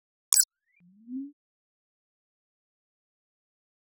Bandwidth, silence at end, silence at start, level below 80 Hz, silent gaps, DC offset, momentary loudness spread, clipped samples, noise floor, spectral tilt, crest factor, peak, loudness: 2.4 kHz; 2.7 s; 0.3 s; under -90 dBFS; none; under 0.1%; 20 LU; under 0.1%; -63 dBFS; -0.5 dB/octave; 32 dB; -4 dBFS; -23 LUFS